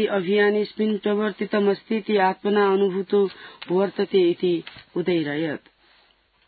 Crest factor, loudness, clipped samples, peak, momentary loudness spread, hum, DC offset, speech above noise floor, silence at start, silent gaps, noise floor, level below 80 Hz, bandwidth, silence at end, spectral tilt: 14 dB; -22 LUFS; under 0.1%; -8 dBFS; 8 LU; none; under 0.1%; 39 dB; 0 s; none; -61 dBFS; -70 dBFS; 4.8 kHz; 0.9 s; -11 dB/octave